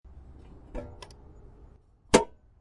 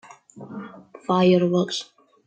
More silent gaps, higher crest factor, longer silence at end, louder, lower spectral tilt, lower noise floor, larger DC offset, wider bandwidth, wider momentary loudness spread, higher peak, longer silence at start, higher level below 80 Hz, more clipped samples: neither; first, 26 dB vs 16 dB; about the same, 0.35 s vs 0.45 s; second, -26 LUFS vs -21 LUFS; second, -4 dB/octave vs -6.5 dB/octave; first, -55 dBFS vs -43 dBFS; neither; first, 11.5 kHz vs 8.8 kHz; first, 26 LU vs 21 LU; about the same, -6 dBFS vs -8 dBFS; first, 0.75 s vs 0.35 s; first, -48 dBFS vs -66 dBFS; neither